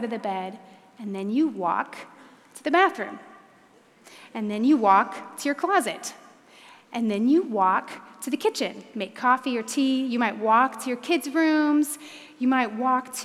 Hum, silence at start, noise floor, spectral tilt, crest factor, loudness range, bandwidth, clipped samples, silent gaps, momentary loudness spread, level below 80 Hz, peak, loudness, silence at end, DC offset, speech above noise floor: none; 0 s; -56 dBFS; -4 dB/octave; 18 dB; 4 LU; 15 kHz; under 0.1%; none; 15 LU; -88 dBFS; -6 dBFS; -24 LUFS; 0 s; under 0.1%; 32 dB